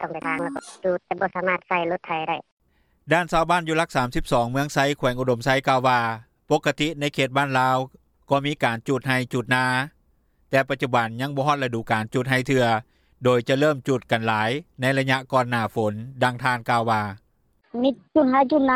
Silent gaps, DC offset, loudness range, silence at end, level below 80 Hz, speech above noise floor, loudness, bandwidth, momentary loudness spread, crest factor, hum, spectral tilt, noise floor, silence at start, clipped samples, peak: 2.52-2.57 s; under 0.1%; 2 LU; 0 s; -48 dBFS; 42 dB; -23 LUFS; 15.5 kHz; 6 LU; 18 dB; none; -5.5 dB/octave; -64 dBFS; 0 s; under 0.1%; -6 dBFS